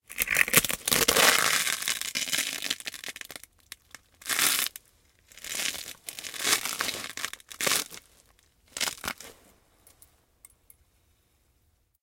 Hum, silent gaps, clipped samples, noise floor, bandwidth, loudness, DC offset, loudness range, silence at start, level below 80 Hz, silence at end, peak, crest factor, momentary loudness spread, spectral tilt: none; none; under 0.1%; -69 dBFS; 17 kHz; -26 LUFS; under 0.1%; 14 LU; 0.1 s; -60 dBFS; 2.7 s; 0 dBFS; 30 dB; 22 LU; 0 dB/octave